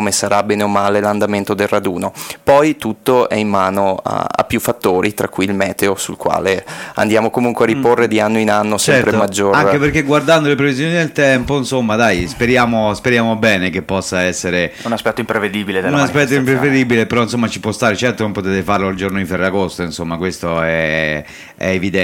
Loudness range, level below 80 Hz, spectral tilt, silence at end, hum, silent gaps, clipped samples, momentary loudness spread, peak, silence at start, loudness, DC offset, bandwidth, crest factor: 4 LU; -42 dBFS; -5 dB/octave; 0 s; none; none; under 0.1%; 7 LU; 0 dBFS; 0 s; -15 LUFS; under 0.1%; 17 kHz; 14 dB